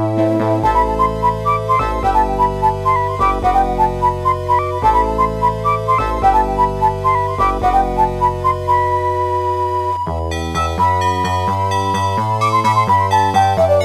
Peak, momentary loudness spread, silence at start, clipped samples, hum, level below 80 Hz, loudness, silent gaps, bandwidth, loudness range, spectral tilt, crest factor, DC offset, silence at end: -2 dBFS; 4 LU; 0 s; under 0.1%; none; -28 dBFS; -16 LUFS; none; 15 kHz; 2 LU; -6.5 dB/octave; 14 dB; under 0.1%; 0 s